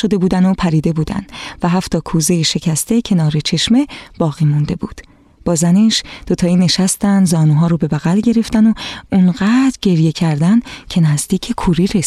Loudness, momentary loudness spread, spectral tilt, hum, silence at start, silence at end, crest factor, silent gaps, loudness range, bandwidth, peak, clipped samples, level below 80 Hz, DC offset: -14 LUFS; 8 LU; -5.5 dB/octave; none; 0 s; 0 s; 12 dB; none; 2 LU; 14 kHz; -2 dBFS; under 0.1%; -38 dBFS; under 0.1%